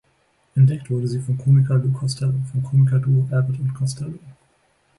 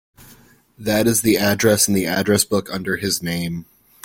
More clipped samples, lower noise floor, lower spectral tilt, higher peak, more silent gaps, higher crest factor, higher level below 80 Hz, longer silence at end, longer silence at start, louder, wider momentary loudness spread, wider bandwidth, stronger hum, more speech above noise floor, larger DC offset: neither; first, -63 dBFS vs -50 dBFS; first, -8 dB/octave vs -3.5 dB/octave; second, -6 dBFS vs -2 dBFS; neither; about the same, 14 dB vs 18 dB; about the same, -54 dBFS vs -50 dBFS; first, 0.65 s vs 0.4 s; first, 0.55 s vs 0.2 s; about the same, -20 LUFS vs -18 LUFS; about the same, 9 LU vs 9 LU; second, 11.5 kHz vs 16.5 kHz; neither; first, 44 dB vs 31 dB; neither